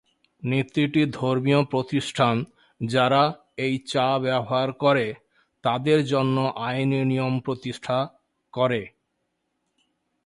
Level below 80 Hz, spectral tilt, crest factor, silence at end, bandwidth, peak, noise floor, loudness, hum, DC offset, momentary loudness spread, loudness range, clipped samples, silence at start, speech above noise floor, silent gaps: -62 dBFS; -6.5 dB/octave; 18 dB; 1.35 s; 11.5 kHz; -6 dBFS; -76 dBFS; -24 LUFS; none; under 0.1%; 10 LU; 4 LU; under 0.1%; 0.45 s; 53 dB; none